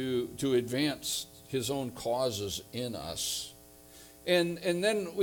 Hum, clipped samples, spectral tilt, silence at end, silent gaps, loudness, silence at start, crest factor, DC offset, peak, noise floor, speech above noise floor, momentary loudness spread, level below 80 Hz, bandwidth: none; under 0.1%; -4 dB/octave; 0 s; none; -32 LUFS; 0 s; 18 dB; under 0.1%; -14 dBFS; -54 dBFS; 22 dB; 9 LU; -62 dBFS; 19.5 kHz